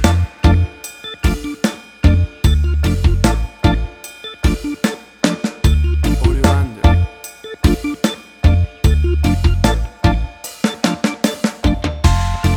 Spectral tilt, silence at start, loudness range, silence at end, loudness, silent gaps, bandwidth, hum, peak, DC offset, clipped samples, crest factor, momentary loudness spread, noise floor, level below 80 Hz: -6 dB/octave; 0 s; 2 LU; 0 s; -17 LUFS; none; 16.5 kHz; none; 0 dBFS; under 0.1%; under 0.1%; 16 dB; 7 LU; -33 dBFS; -18 dBFS